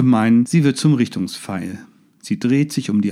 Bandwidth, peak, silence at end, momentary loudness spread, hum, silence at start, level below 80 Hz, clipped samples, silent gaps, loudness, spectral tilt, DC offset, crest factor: 13.5 kHz; -4 dBFS; 0 s; 13 LU; none; 0 s; -66 dBFS; under 0.1%; none; -18 LUFS; -6.5 dB/octave; under 0.1%; 14 dB